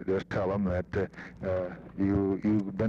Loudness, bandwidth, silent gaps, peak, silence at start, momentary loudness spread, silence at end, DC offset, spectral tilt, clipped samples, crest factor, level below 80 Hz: -31 LUFS; 7.2 kHz; none; -16 dBFS; 0 s; 8 LU; 0 s; under 0.1%; -9 dB/octave; under 0.1%; 14 dB; -50 dBFS